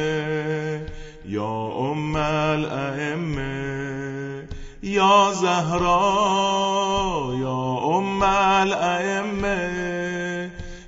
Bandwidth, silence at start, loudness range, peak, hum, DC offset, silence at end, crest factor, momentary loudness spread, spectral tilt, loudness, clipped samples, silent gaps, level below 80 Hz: 8 kHz; 0 s; 6 LU; -4 dBFS; none; under 0.1%; 0 s; 18 dB; 13 LU; -5 dB/octave; -22 LUFS; under 0.1%; none; -42 dBFS